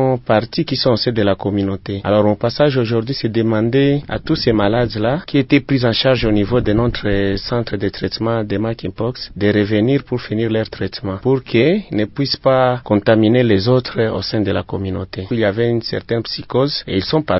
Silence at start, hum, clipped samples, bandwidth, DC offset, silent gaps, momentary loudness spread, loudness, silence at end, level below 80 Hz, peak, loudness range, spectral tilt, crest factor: 0 s; none; under 0.1%; 5.8 kHz; under 0.1%; none; 7 LU; -17 LUFS; 0 s; -38 dBFS; 0 dBFS; 3 LU; -10 dB/octave; 16 dB